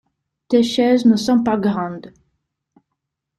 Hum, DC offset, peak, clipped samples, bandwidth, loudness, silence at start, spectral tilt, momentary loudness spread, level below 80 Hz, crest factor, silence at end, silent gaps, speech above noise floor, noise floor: none; under 0.1%; -4 dBFS; under 0.1%; 12 kHz; -17 LUFS; 0.5 s; -6 dB/octave; 11 LU; -58 dBFS; 16 dB; 1.3 s; none; 62 dB; -78 dBFS